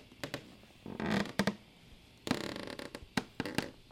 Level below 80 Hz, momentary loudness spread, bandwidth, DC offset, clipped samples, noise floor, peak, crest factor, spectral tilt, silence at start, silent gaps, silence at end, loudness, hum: -62 dBFS; 20 LU; 16.5 kHz; under 0.1%; under 0.1%; -58 dBFS; -12 dBFS; 28 dB; -4.5 dB/octave; 0 s; none; 0 s; -38 LUFS; none